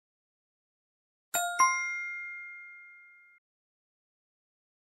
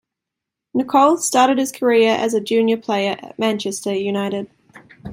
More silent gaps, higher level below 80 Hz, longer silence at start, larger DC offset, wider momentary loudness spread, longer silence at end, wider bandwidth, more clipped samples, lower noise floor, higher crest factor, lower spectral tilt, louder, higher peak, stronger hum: neither; second, -84 dBFS vs -60 dBFS; first, 1.35 s vs 0.75 s; neither; first, 22 LU vs 10 LU; first, 1.75 s vs 0 s; about the same, 16 kHz vs 16.5 kHz; neither; second, -56 dBFS vs -83 dBFS; first, 24 dB vs 16 dB; second, 2 dB/octave vs -4 dB/octave; second, -30 LUFS vs -18 LUFS; second, -12 dBFS vs -2 dBFS; neither